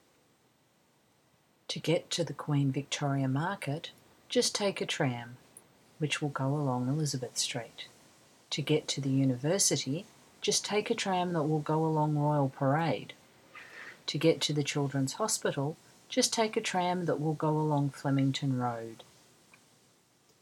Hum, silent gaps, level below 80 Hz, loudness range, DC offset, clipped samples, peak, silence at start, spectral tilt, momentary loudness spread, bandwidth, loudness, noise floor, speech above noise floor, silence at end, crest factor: none; none; -76 dBFS; 4 LU; under 0.1%; under 0.1%; -12 dBFS; 1.7 s; -4.5 dB/octave; 12 LU; 15.5 kHz; -31 LUFS; -69 dBFS; 38 dB; 1.4 s; 20 dB